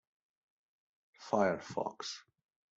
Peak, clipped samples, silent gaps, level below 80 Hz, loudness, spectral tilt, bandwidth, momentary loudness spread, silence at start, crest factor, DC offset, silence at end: -16 dBFS; under 0.1%; none; -78 dBFS; -36 LUFS; -4.5 dB/octave; 8 kHz; 16 LU; 1.2 s; 24 dB; under 0.1%; 0.55 s